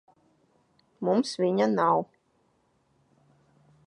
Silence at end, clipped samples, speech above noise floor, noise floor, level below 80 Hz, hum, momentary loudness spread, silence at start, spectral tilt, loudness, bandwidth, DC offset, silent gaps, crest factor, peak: 1.8 s; under 0.1%; 45 dB; -69 dBFS; -78 dBFS; none; 8 LU; 1 s; -6 dB/octave; -26 LUFS; 11 kHz; under 0.1%; none; 18 dB; -12 dBFS